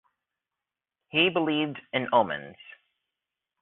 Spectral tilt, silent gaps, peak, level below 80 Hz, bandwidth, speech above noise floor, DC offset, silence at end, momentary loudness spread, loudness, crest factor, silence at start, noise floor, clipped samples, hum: -2 dB/octave; none; -8 dBFS; -74 dBFS; 4.2 kHz; 63 dB; under 0.1%; 0.9 s; 10 LU; -26 LUFS; 22 dB; 1.15 s; -89 dBFS; under 0.1%; none